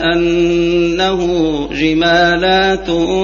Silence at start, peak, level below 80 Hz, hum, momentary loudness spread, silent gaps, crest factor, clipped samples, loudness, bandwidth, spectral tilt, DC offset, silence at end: 0 s; 0 dBFS; -32 dBFS; none; 5 LU; none; 12 dB; under 0.1%; -13 LUFS; 7.2 kHz; -5.5 dB/octave; under 0.1%; 0 s